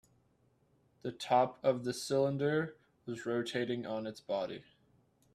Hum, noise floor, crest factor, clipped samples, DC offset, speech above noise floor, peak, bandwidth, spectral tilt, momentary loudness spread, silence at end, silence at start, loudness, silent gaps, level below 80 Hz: none; -72 dBFS; 20 dB; under 0.1%; under 0.1%; 38 dB; -16 dBFS; 14 kHz; -5.5 dB/octave; 14 LU; 0.7 s; 1.05 s; -35 LUFS; none; -76 dBFS